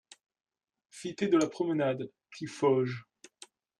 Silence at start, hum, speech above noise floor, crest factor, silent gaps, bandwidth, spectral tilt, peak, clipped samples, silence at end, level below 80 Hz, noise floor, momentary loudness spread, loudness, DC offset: 0.95 s; none; 28 dB; 18 dB; none; 11.5 kHz; -6 dB/octave; -14 dBFS; under 0.1%; 0.8 s; -76 dBFS; -58 dBFS; 16 LU; -30 LUFS; under 0.1%